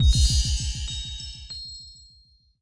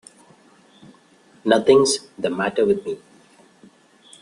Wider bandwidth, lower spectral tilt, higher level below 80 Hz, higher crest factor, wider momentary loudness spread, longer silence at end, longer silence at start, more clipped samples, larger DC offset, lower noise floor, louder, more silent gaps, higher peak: about the same, 10.5 kHz vs 11 kHz; about the same, -3 dB/octave vs -3.5 dB/octave; first, -26 dBFS vs -62 dBFS; about the same, 16 dB vs 20 dB; first, 18 LU vs 15 LU; second, 0.7 s vs 1.25 s; second, 0 s vs 1.45 s; neither; neither; first, -58 dBFS vs -54 dBFS; second, -26 LUFS vs -19 LUFS; neither; second, -8 dBFS vs -2 dBFS